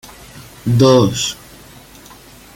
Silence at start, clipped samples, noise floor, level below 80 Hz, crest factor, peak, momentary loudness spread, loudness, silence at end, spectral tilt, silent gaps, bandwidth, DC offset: 0.35 s; under 0.1%; -41 dBFS; -46 dBFS; 16 dB; 0 dBFS; 26 LU; -14 LUFS; 1.2 s; -5.5 dB/octave; none; 17 kHz; under 0.1%